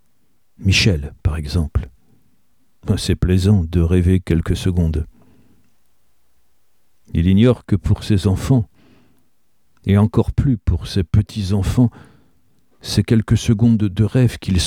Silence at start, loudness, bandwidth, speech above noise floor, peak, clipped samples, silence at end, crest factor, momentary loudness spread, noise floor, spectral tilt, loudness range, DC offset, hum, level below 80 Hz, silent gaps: 0.6 s; -18 LUFS; 14 kHz; 51 dB; -2 dBFS; under 0.1%; 0 s; 16 dB; 9 LU; -67 dBFS; -6.5 dB/octave; 3 LU; 0.2%; none; -30 dBFS; none